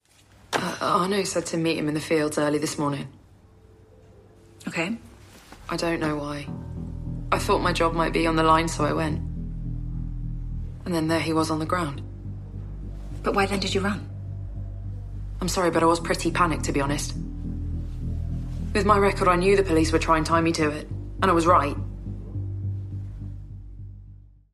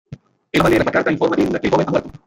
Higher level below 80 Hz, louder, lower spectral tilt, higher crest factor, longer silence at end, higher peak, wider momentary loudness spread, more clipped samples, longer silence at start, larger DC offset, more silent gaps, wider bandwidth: first, -36 dBFS vs -42 dBFS; second, -25 LUFS vs -17 LUFS; about the same, -5.5 dB/octave vs -6.5 dB/octave; about the same, 20 dB vs 16 dB; first, 0.4 s vs 0.15 s; second, -6 dBFS vs -2 dBFS; first, 16 LU vs 4 LU; neither; first, 0.5 s vs 0.1 s; neither; neither; second, 14.5 kHz vs 16.5 kHz